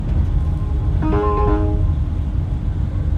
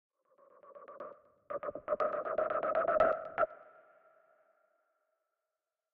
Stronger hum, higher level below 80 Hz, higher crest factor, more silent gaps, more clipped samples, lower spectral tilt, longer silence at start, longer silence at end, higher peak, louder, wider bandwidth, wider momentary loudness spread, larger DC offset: neither; first, -20 dBFS vs -70 dBFS; second, 12 dB vs 22 dB; neither; neither; first, -10 dB/octave vs -3.5 dB/octave; second, 0 s vs 0.65 s; second, 0 s vs 2.3 s; first, -6 dBFS vs -16 dBFS; first, -20 LUFS vs -34 LUFS; about the same, 5 kHz vs 5 kHz; second, 5 LU vs 21 LU; neither